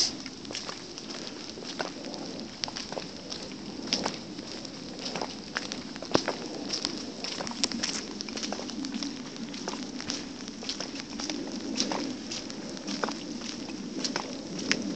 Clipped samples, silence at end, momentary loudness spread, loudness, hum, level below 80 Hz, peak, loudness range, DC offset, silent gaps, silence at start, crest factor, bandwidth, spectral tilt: under 0.1%; 0 s; 9 LU; -34 LUFS; none; -62 dBFS; -4 dBFS; 3 LU; 0.1%; none; 0 s; 32 dB; 9 kHz; -2.5 dB/octave